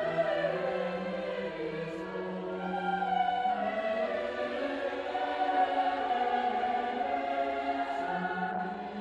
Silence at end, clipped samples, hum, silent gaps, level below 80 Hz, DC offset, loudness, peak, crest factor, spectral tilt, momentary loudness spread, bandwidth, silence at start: 0 s; under 0.1%; none; none; -66 dBFS; under 0.1%; -32 LUFS; -18 dBFS; 14 dB; -6.5 dB/octave; 7 LU; 8.8 kHz; 0 s